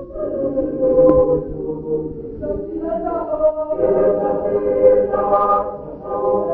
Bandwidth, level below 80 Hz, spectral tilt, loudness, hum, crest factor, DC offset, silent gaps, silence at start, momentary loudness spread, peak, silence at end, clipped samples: 3 kHz; -40 dBFS; -12 dB/octave; -18 LUFS; none; 18 dB; under 0.1%; none; 0 s; 12 LU; 0 dBFS; 0 s; under 0.1%